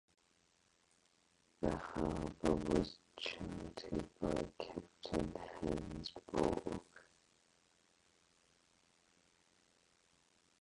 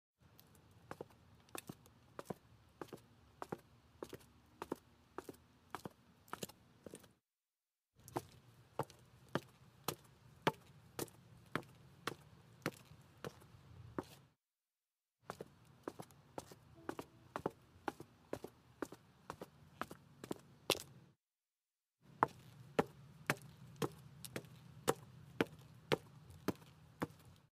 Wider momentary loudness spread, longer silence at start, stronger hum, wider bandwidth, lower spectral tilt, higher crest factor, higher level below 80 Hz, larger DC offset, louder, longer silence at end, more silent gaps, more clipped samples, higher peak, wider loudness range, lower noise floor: second, 10 LU vs 22 LU; first, 1.6 s vs 0.75 s; neither; second, 11.5 kHz vs 15.5 kHz; first, -6 dB/octave vs -4.5 dB/octave; second, 24 dB vs 34 dB; first, -58 dBFS vs -76 dBFS; neither; first, -42 LUFS vs -47 LUFS; first, 3.6 s vs 0.2 s; neither; neither; second, -20 dBFS vs -14 dBFS; second, 5 LU vs 11 LU; second, -75 dBFS vs under -90 dBFS